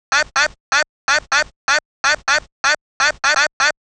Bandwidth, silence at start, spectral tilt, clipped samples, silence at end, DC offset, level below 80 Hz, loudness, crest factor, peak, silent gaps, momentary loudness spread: 11 kHz; 0.1 s; 1 dB/octave; under 0.1%; 0.1 s; under 0.1%; -48 dBFS; -17 LUFS; 18 dB; 0 dBFS; 0.60-0.72 s, 0.89-1.08 s, 1.56-1.68 s, 1.85-2.04 s, 2.52-2.64 s, 2.81-3.00 s, 3.53-3.60 s; 3 LU